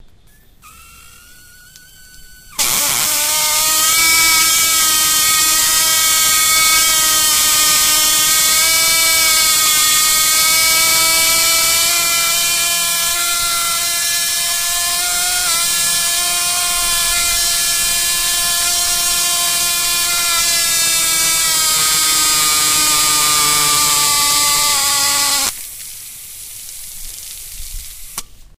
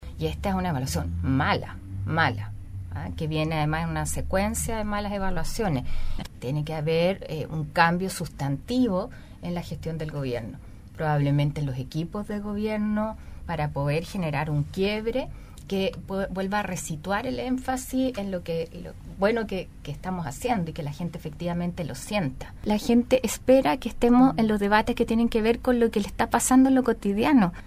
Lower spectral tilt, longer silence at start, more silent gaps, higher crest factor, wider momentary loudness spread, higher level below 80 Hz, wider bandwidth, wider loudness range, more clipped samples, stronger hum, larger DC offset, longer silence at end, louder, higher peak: second, 1.5 dB/octave vs -5.5 dB/octave; first, 0.65 s vs 0 s; neither; second, 14 dB vs 22 dB; first, 17 LU vs 13 LU; about the same, -40 dBFS vs -38 dBFS; about the same, 16 kHz vs 15.5 kHz; about the same, 5 LU vs 7 LU; neither; neither; neither; first, 0.15 s vs 0 s; first, -11 LUFS vs -26 LUFS; first, 0 dBFS vs -4 dBFS